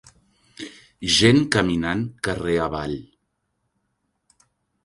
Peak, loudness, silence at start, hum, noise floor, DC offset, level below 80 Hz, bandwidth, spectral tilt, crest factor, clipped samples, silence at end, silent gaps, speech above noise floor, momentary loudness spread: -2 dBFS; -21 LUFS; 0.6 s; none; -74 dBFS; under 0.1%; -46 dBFS; 11.5 kHz; -4.5 dB/octave; 24 dB; under 0.1%; 1.85 s; none; 54 dB; 23 LU